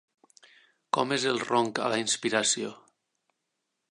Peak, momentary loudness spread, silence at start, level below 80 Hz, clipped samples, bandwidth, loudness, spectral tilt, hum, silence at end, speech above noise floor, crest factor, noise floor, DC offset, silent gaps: -8 dBFS; 5 LU; 0.95 s; -78 dBFS; under 0.1%; 11.5 kHz; -27 LUFS; -2.5 dB/octave; none; 1.15 s; 54 dB; 22 dB; -82 dBFS; under 0.1%; none